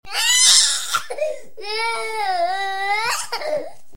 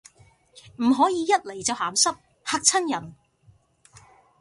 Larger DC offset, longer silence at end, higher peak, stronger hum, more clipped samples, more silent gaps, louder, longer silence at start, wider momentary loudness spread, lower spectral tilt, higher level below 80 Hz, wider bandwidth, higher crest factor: first, 2% vs under 0.1%; second, 0.25 s vs 1.25 s; first, 0 dBFS vs -4 dBFS; neither; neither; neither; first, -18 LUFS vs -23 LUFS; second, 0 s vs 0.8 s; first, 16 LU vs 9 LU; second, 2.5 dB/octave vs -1.5 dB/octave; first, -58 dBFS vs -66 dBFS; first, 16.5 kHz vs 11.5 kHz; about the same, 20 dB vs 22 dB